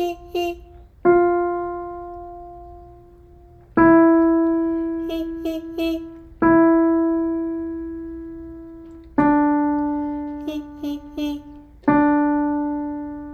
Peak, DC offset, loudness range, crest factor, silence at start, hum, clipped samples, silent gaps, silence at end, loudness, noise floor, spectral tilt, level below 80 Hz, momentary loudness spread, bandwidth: -4 dBFS; under 0.1%; 4 LU; 18 dB; 0 s; none; under 0.1%; none; 0 s; -20 LUFS; -46 dBFS; -7.5 dB/octave; -46 dBFS; 21 LU; 6.6 kHz